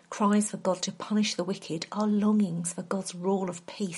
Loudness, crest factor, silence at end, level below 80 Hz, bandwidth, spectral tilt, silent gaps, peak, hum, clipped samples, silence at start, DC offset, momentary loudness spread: -29 LUFS; 16 dB; 0 s; -74 dBFS; 11.5 kHz; -5 dB/octave; none; -14 dBFS; none; under 0.1%; 0.1 s; under 0.1%; 9 LU